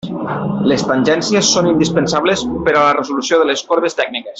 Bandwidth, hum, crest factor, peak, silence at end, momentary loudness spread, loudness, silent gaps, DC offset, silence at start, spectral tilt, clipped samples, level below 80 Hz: 8.2 kHz; none; 14 dB; -2 dBFS; 0 s; 6 LU; -14 LUFS; none; under 0.1%; 0.05 s; -4 dB/octave; under 0.1%; -46 dBFS